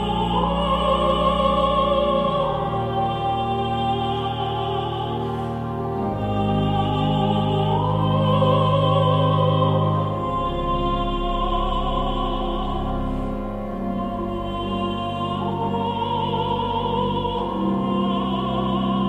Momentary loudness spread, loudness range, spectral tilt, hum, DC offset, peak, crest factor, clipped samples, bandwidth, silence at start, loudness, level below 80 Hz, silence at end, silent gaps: 8 LU; 6 LU; -8 dB/octave; none; under 0.1%; -6 dBFS; 14 dB; under 0.1%; 8.8 kHz; 0 s; -22 LUFS; -34 dBFS; 0 s; none